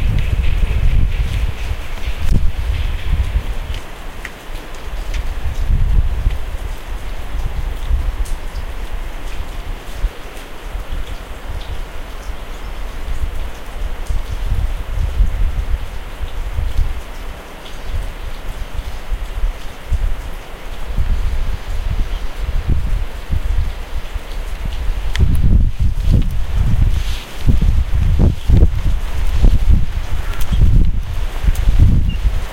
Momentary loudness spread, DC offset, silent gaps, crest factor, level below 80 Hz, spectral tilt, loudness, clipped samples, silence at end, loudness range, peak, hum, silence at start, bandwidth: 14 LU; under 0.1%; none; 16 dB; -16 dBFS; -6.5 dB/octave; -21 LUFS; under 0.1%; 0 s; 11 LU; 0 dBFS; none; 0 s; 15.5 kHz